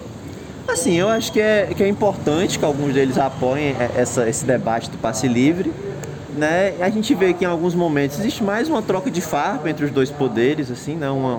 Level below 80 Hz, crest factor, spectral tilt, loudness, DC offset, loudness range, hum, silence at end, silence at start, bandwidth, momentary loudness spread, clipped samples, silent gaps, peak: -50 dBFS; 14 dB; -5 dB/octave; -19 LUFS; under 0.1%; 2 LU; none; 0 s; 0 s; 19.5 kHz; 7 LU; under 0.1%; none; -6 dBFS